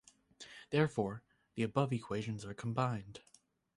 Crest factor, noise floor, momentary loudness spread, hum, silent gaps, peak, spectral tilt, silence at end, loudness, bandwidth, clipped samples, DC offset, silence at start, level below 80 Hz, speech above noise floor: 22 dB; -59 dBFS; 19 LU; none; none; -18 dBFS; -7 dB/octave; 0.55 s; -37 LUFS; 11.5 kHz; under 0.1%; under 0.1%; 0.4 s; -68 dBFS; 22 dB